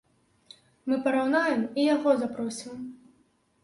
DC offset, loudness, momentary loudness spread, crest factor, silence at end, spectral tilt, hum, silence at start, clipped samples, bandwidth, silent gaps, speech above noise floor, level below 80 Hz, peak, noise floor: under 0.1%; -26 LUFS; 15 LU; 18 dB; 0.7 s; -4.5 dB/octave; none; 0.85 s; under 0.1%; 11.5 kHz; none; 41 dB; -72 dBFS; -10 dBFS; -67 dBFS